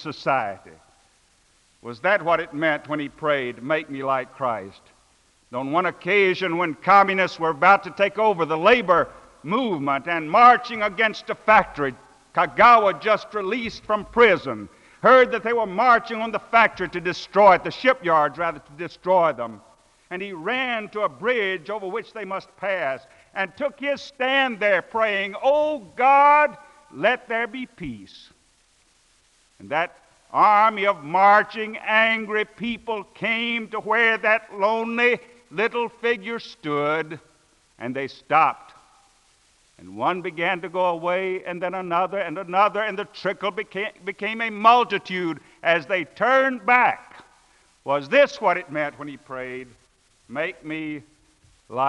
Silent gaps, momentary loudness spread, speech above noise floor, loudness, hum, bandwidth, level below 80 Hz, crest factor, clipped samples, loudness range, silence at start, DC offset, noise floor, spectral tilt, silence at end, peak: none; 16 LU; 40 dB; -21 LUFS; none; 11 kHz; -60 dBFS; 20 dB; under 0.1%; 8 LU; 0 s; under 0.1%; -61 dBFS; -5 dB/octave; 0 s; -2 dBFS